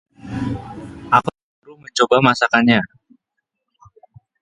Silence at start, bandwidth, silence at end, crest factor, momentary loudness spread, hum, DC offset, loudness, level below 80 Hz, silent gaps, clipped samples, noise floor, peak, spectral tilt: 0.25 s; 10.5 kHz; 1.55 s; 20 dB; 18 LU; none; under 0.1%; -17 LUFS; -48 dBFS; 1.43-1.62 s; under 0.1%; -77 dBFS; 0 dBFS; -5 dB/octave